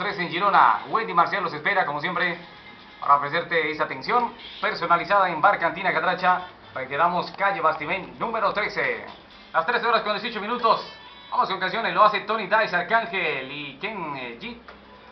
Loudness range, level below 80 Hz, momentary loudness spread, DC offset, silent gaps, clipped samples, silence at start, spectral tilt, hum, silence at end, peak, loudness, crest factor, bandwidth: 3 LU; -62 dBFS; 13 LU; under 0.1%; none; under 0.1%; 0 s; -1.5 dB/octave; none; 0 s; -4 dBFS; -23 LUFS; 20 dB; 6.2 kHz